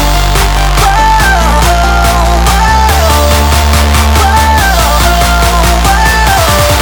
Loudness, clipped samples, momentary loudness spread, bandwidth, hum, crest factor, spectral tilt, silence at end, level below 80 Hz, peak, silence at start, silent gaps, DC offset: -7 LUFS; 0.6%; 2 LU; over 20 kHz; none; 6 dB; -4 dB/octave; 0 s; -10 dBFS; 0 dBFS; 0 s; none; under 0.1%